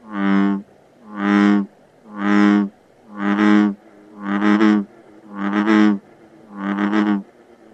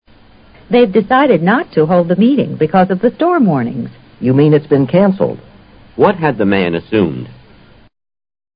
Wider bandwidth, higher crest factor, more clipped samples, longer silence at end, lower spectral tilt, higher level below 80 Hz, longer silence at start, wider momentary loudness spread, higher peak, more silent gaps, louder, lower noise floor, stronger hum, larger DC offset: first, 8 kHz vs 5.2 kHz; about the same, 16 dB vs 14 dB; neither; second, 0.5 s vs 1.25 s; second, -7.5 dB/octave vs -12 dB/octave; second, -64 dBFS vs -46 dBFS; second, 0.05 s vs 0.7 s; first, 17 LU vs 10 LU; second, -4 dBFS vs 0 dBFS; neither; second, -18 LUFS vs -12 LUFS; first, -47 dBFS vs -43 dBFS; neither; neither